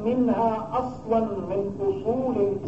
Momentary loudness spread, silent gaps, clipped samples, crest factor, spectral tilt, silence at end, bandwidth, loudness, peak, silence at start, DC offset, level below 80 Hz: 6 LU; none; under 0.1%; 14 dB; -9 dB/octave; 0 s; 7.8 kHz; -26 LUFS; -12 dBFS; 0 s; 0.3%; -52 dBFS